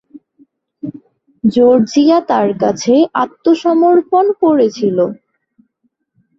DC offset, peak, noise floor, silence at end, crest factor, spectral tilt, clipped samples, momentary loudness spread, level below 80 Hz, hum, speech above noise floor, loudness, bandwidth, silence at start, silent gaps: under 0.1%; -2 dBFS; -65 dBFS; 1.25 s; 12 dB; -6 dB/octave; under 0.1%; 9 LU; -58 dBFS; none; 54 dB; -12 LUFS; 7.6 kHz; 0.15 s; none